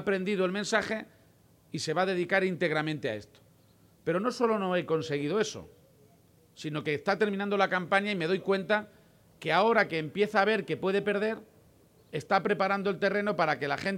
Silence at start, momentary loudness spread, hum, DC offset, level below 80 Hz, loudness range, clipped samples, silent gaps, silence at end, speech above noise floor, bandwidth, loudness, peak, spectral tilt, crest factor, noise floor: 0 s; 11 LU; none; under 0.1%; -70 dBFS; 4 LU; under 0.1%; none; 0 s; 33 dB; 16 kHz; -29 LUFS; -10 dBFS; -5 dB/octave; 20 dB; -62 dBFS